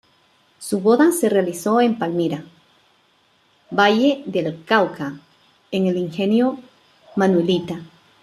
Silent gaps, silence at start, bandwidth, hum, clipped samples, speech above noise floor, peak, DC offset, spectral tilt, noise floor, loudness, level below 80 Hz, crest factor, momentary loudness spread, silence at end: none; 0.6 s; 14 kHz; none; under 0.1%; 41 dB; -2 dBFS; under 0.1%; -5.5 dB/octave; -60 dBFS; -19 LUFS; -66 dBFS; 18 dB; 15 LU; 0.4 s